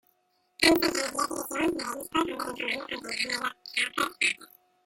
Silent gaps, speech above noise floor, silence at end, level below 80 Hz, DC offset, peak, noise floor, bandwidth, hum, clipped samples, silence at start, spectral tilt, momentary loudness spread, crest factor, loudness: none; 42 dB; 0.4 s; -60 dBFS; under 0.1%; -6 dBFS; -71 dBFS; 16.5 kHz; none; under 0.1%; 0.6 s; -2 dB/octave; 10 LU; 24 dB; -28 LUFS